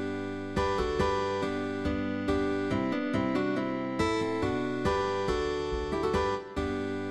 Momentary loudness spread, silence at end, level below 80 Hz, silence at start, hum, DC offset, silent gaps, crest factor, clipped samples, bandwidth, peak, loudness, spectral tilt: 4 LU; 0 s; -44 dBFS; 0 s; none; 0.2%; none; 14 dB; under 0.1%; 12 kHz; -16 dBFS; -30 LUFS; -6 dB/octave